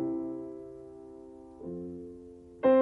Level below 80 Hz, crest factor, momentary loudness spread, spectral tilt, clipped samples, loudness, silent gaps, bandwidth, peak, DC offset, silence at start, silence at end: -64 dBFS; 18 dB; 19 LU; -9 dB/octave; under 0.1%; -35 LUFS; none; 4 kHz; -14 dBFS; under 0.1%; 0 s; 0 s